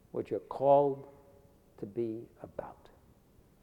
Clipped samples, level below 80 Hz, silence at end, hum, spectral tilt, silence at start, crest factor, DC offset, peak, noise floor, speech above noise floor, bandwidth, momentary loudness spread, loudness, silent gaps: under 0.1%; -68 dBFS; 0.9 s; none; -9 dB/octave; 0.15 s; 22 dB; under 0.1%; -14 dBFS; -63 dBFS; 31 dB; 5.2 kHz; 20 LU; -31 LUFS; none